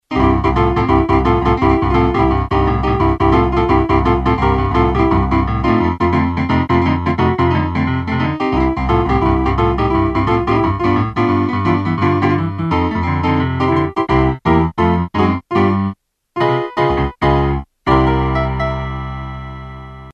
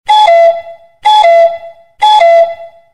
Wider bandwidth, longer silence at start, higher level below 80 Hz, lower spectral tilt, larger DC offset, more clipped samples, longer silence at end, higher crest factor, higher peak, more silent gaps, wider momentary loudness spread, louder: second, 7.8 kHz vs 11 kHz; about the same, 0.1 s vs 0.1 s; first, -24 dBFS vs -52 dBFS; first, -8.5 dB/octave vs 0.5 dB/octave; second, under 0.1% vs 0.6%; second, under 0.1% vs 0.3%; second, 0 s vs 0.25 s; first, 14 dB vs 8 dB; about the same, 0 dBFS vs 0 dBFS; neither; second, 5 LU vs 14 LU; second, -15 LUFS vs -7 LUFS